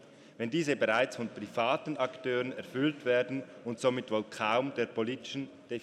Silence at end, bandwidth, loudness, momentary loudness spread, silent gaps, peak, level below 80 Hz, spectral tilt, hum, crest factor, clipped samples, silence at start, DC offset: 0 s; 12.5 kHz; -32 LUFS; 10 LU; none; -14 dBFS; -80 dBFS; -5 dB/octave; none; 18 dB; under 0.1%; 0 s; under 0.1%